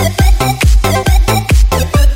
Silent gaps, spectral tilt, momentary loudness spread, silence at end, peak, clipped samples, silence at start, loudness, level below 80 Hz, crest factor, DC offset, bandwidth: none; -5 dB/octave; 1 LU; 0 s; 0 dBFS; under 0.1%; 0 s; -11 LUFS; -10 dBFS; 8 dB; under 0.1%; 16.5 kHz